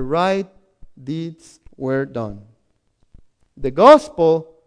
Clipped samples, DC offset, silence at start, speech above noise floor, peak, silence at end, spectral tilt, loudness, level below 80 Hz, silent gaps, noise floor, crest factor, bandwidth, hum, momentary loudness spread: under 0.1%; under 0.1%; 0 s; 48 dB; 0 dBFS; 0.25 s; -6.5 dB/octave; -16 LUFS; -46 dBFS; none; -64 dBFS; 18 dB; 10.5 kHz; none; 22 LU